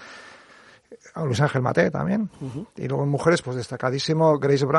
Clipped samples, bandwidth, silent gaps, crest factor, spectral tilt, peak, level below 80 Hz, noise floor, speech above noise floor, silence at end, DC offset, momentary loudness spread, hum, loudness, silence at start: under 0.1%; 11.5 kHz; none; 20 dB; -6.5 dB/octave; -4 dBFS; -58 dBFS; -51 dBFS; 29 dB; 0 s; under 0.1%; 15 LU; none; -23 LUFS; 0 s